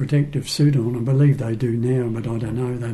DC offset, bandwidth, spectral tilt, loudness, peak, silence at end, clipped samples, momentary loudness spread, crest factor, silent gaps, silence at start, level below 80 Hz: under 0.1%; 12.5 kHz; -7.5 dB/octave; -21 LUFS; -8 dBFS; 0 s; under 0.1%; 7 LU; 12 dB; none; 0 s; -46 dBFS